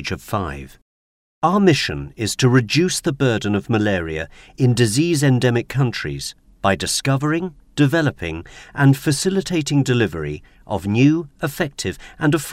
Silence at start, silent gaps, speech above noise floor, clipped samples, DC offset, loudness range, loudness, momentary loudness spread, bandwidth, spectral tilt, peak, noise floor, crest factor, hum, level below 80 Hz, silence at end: 0 s; 0.82-1.42 s; over 71 dB; under 0.1%; under 0.1%; 2 LU; -19 LUFS; 13 LU; 16 kHz; -5.5 dB/octave; -2 dBFS; under -90 dBFS; 18 dB; none; -44 dBFS; 0 s